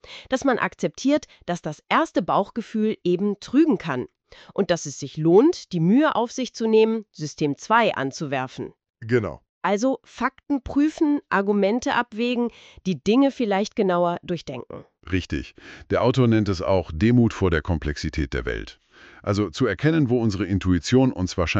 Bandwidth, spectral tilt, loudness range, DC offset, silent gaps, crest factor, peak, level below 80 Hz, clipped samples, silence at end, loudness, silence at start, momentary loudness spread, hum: 8.2 kHz; -6.5 dB/octave; 3 LU; under 0.1%; 9.49-9.61 s; 18 dB; -4 dBFS; -42 dBFS; under 0.1%; 0 s; -23 LUFS; 0.1 s; 12 LU; none